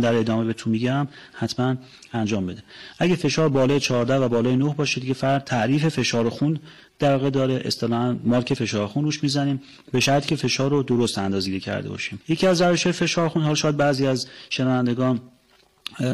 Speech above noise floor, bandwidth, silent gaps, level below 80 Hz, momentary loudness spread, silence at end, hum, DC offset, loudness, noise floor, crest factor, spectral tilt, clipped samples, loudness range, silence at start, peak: 37 dB; 15 kHz; none; -56 dBFS; 9 LU; 0 s; none; under 0.1%; -22 LUFS; -59 dBFS; 10 dB; -5.5 dB/octave; under 0.1%; 2 LU; 0 s; -12 dBFS